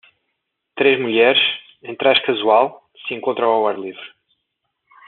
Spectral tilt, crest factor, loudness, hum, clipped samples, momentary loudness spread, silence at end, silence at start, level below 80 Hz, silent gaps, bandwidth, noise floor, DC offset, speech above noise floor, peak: -0.5 dB/octave; 18 dB; -16 LUFS; none; under 0.1%; 18 LU; 1 s; 0.75 s; -70 dBFS; none; 4.4 kHz; -75 dBFS; under 0.1%; 58 dB; -2 dBFS